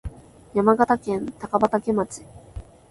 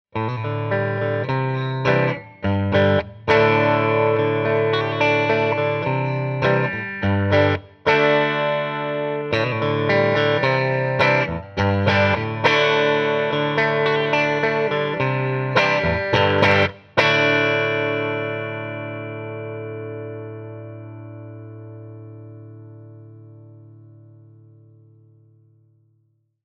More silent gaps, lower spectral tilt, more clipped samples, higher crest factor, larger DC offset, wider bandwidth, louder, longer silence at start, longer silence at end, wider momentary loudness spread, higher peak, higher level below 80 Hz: neither; about the same, -7 dB/octave vs -6.5 dB/octave; neither; about the same, 20 dB vs 20 dB; neither; first, 11.5 kHz vs 7 kHz; second, -22 LUFS vs -19 LUFS; about the same, 0.05 s vs 0.15 s; second, 0.3 s vs 2.85 s; first, 23 LU vs 17 LU; second, -4 dBFS vs 0 dBFS; first, -46 dBFS vs -52 dBFS